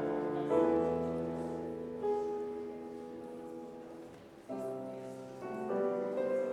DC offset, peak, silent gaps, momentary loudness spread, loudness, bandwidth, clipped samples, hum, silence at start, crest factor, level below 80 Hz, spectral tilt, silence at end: under 0.1%; -18 dBFS; none; 16 LU; -37 LUFS; 12.5 kHz; under 0.1%; none; 0 s; 18 dB; -70 dBFS; -8 dB/octave; 0 s